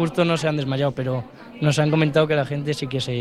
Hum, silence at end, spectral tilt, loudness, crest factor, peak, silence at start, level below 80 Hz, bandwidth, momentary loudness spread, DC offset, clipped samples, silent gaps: none; 0 s; -6 dB/octave; -22 LUFS; 16 dB; -6 dBFS; 0 s; -54 dBFS; 12 kHz; 8 LU; 0.1%; under 0.1%; none